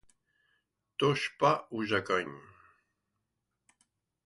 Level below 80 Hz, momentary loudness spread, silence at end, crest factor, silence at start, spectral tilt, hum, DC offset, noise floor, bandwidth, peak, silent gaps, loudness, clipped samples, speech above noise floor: -70 dBFS; 15 LU; 1.9 s; 22 dB; 1 s; -5 dB/octave; none; under 0.1%; -84 dBFS; 11.5 kHz; -12 dBFS; none; -30 LUFS; under 0.1%; 54 dB